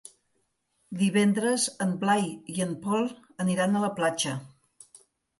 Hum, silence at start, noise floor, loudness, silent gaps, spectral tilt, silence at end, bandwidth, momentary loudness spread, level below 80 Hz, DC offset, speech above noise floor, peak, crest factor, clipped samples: none; 0.9 s; -74 dBFS; -27 LUFS; none; -4.5 dB/octave; 0.95 s; 11.5 kHz; 8 LU; -72 dBFS; under 0.1%; 48 dB; -10 dBFS; 18 dB; under 0.1%